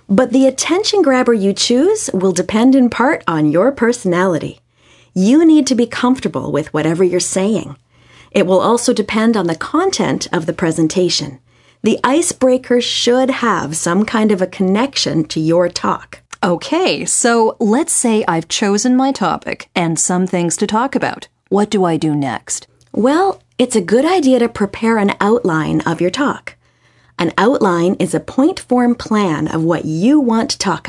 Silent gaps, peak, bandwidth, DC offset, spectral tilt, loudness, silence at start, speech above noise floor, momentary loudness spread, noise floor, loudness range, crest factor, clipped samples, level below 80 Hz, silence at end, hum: none; 0 dBFS; 11.5 kHz; under 0.1%; -4.5 dB/octave; -14 LUFS; 0.1 s; 39 dB; 7 LU; -53 dBFS; 3 LU; 14 dB; under 0.1%; -52 dBFS; 0 s; none